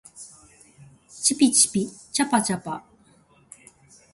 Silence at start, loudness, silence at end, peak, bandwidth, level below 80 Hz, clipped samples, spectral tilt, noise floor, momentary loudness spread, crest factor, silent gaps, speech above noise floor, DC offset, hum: 0.15 s; -21 LUFS; 1.35 s; -4 dBFS; 12 kHz; -66 dBFS; under 0.1%; -2.5 dB/octave; -58 dBFS; 25 LU; 22 dB; none; 35 dB; under 0.1%; none